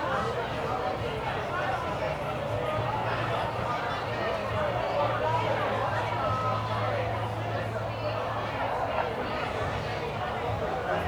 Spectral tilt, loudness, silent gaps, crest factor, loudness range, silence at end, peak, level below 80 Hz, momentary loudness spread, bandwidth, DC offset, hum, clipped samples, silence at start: -6 dB/octave; -30 LUFS; none; 16 dB; 2 LU; 0 s; -14 dBFS; -48 dBFS; 4 LU; over 20 kHz; under 0.1%; none; under 0.1%; 0 s